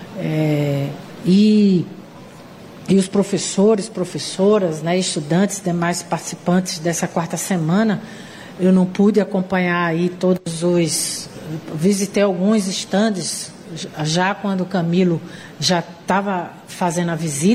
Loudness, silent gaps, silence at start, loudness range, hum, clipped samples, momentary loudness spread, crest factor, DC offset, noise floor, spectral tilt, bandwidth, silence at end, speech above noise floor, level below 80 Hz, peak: -19 LUFS; none; 0 s; 2 LU; none; under 0.1%; 12 LU; 14 dB; under 0.1%; -39 dBFS; -5 dB/octave; 15 kHz; 0 s; 21 dB; -58 dBFS; -4 dBFS